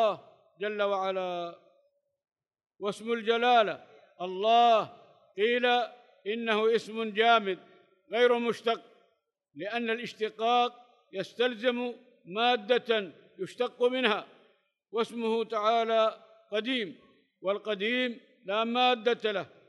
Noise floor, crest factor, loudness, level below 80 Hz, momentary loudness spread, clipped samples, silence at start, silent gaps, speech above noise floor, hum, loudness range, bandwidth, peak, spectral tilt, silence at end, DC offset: -75 dBFS; 20 dB; -29 LUFS; under -90 dBFS; 15 LU; under 0.1%; 0 s; none; 46 dB; none; 4 LU; 11.5 kHz; -10 dBFS; -4.5 dB/octave; 0.2 s; under 0.1%